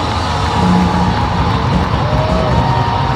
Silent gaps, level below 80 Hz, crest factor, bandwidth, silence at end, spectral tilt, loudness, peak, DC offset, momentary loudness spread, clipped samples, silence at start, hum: none; -22 dBFS; 12 dB; 12 kHz; 0 s; -6.5 dB/octave; -14 LUFS; 0 dBFS; 0.4%; 3 LU; under 0.1%; 0 s; none